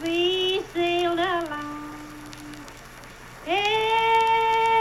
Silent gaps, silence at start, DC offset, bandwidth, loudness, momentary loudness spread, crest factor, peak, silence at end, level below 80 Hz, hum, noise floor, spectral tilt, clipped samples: none; 0 s; under 0.1%; 15 kHz; -23 LUFS; 22 LU; 14 dB; -10 dBFS; 0 s; -52 dBFS; none; -43 dBFS; -3.5 dB/octave; under 0.1%